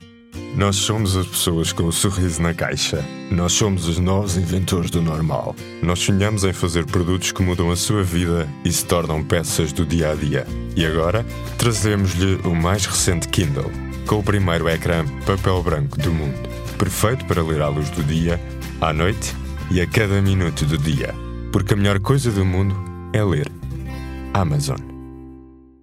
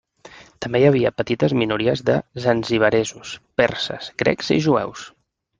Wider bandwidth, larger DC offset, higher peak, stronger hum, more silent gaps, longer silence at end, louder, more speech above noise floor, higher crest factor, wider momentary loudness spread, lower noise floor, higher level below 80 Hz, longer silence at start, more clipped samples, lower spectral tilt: first, 16 kHz vs 9.8 kHz; neither; about the same, -2 dBFS vs -2 dBFS; neither; neither; second, 0.25 s vs 0.5 s; about the same, -20 LUFS vs -20 LUFS; about the same, 24 dB vs 26 dB; about the same, 18 dB vs 18 dB; about the same, 8 LU vs 10 LU; about the same, -43 dBFS vs -46 dBFS; first, -34 dBFS vs -52 dBFS; second, 0 s vs 0.25 s; neither; about the same, -5 dB/octave vs -5.5 dB/octave